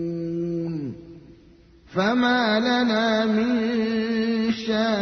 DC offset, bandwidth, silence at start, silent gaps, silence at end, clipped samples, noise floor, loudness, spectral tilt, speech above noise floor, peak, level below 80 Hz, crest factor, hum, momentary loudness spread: under 0.1%; 6.4 kHz; 0 s; none; 0 s; under 0.1%; -52 dBFS; -23 LUFS; -6 dB/octave; 30 dB; -8 dBFS; -56 dBFS; 16 dB; none; 10 LU